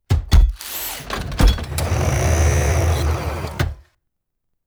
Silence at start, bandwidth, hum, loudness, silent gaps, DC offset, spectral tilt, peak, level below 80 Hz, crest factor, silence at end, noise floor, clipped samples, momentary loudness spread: 0.1 s; over 20 kHz; none; -20 LUFS; none; under 0.1%; -5 dB/octave; -2 dBFS; -20 dBFS; 16 dB; 0.85 s; -74 dBFS; under 0.1%; 9 LU